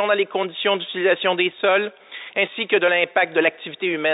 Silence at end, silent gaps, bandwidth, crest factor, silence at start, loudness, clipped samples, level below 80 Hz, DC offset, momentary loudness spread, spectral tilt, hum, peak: 0 s; none; 4 kHz; 18 dB; 0 s; -20 LUFS; under 0.1%; -82 dBFS; under 0.1%; 7 LU; -8.5 dB/octave; none; -4 dBFS